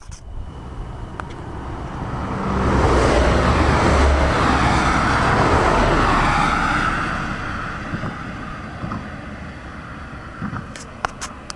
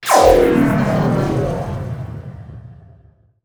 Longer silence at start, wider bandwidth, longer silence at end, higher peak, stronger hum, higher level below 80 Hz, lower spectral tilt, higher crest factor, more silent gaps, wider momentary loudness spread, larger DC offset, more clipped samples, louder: about the same, 0 s vs 0 s; second, 11.5 kHz vs over 20 kHz; second, 0 s vs 0.7 s; about the same, 0 dBFS vs 0 dBFS; neither; first, -26 dBFS vs -34 dBFS; about the same, -5.5 dB/octave vs -6 dB/octave; about the same, 20 dB vs 16 dB; neither; second, 18 LU vs 22 LU; neither; neither; second, -19 LUFS vs -15 LUFS